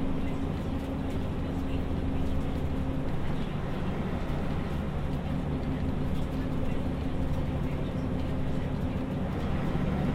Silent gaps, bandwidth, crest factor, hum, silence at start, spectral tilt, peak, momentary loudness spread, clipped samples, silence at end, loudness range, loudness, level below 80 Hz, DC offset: none; 11 kHz; 12 dB; none; 0 s; -8 dB/octave; -16 dBFS; 2 LU; under 0.1%; 0 s; 1 LU; -32 LUFS; -34 dBFS; under 0.1%